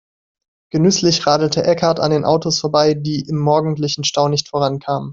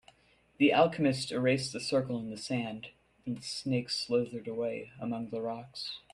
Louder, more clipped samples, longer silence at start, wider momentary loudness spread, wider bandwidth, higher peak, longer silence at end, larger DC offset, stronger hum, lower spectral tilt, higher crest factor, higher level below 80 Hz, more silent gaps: first, -16 LUFS vs -32 LUFS; neither; first, 0.75 s vs 0.6 s; second, 6 LU vs 13 LU; second, 7.6 kHz vs 12.5 kHz; first, -2 dBFS vs -12 dBFS; second, 0 s vs 0.15 s; neither; neither; about the same, -5 dB/octave vs -5 dB/octave; second, 14 dB vs 20 dB; first, -54 dBFS vs -68 dBFS; neither